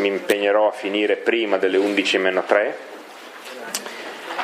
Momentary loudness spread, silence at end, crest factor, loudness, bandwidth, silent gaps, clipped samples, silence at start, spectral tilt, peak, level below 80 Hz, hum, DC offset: 17 LU; 0 s; 18 dB; -20 LUFS; 15.5 kHz; none; under 0.1%; 0 s; -3 dB/octave; -2 dBFS; -80 dBFS; none; under 0.1%